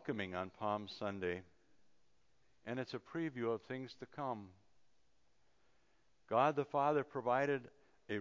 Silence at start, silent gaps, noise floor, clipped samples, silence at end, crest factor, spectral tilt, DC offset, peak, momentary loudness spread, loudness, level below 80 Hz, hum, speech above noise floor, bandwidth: 0 s; none; -79 dBFS; under 0.1%; 0 s; 22 dB; -7 dB/octave; under 0.1%; -20 dBFS; 12 LU; -40 LUFS; -74 dBFS; none; 40 dB; 7.6 kHz